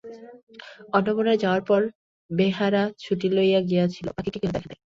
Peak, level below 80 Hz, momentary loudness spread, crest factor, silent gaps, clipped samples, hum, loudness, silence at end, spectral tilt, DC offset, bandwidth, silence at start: -6 dBFS; -56 dBFS; 10 LU; 18 dB; 0.43-0.47 s, 1.95-2.29 s; under 0.1%; none; -24 LUFS; 0.15 s; -7.5 dB/octave; under 0.1%; 7.4 kHz; 0.05 s